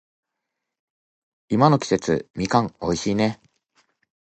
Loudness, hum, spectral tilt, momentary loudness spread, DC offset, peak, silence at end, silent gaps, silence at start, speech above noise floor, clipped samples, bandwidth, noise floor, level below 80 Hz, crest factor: -22 LUFS; none; -6 dB/octave; 8 LU; under 0.1%; -2 dBFS; 1 s; 2.30-2.34 s; 1.5 s; 61 dB; under 0.1%; 8.8 kHz; -82 dBFS; -52 dBFS; 22 dB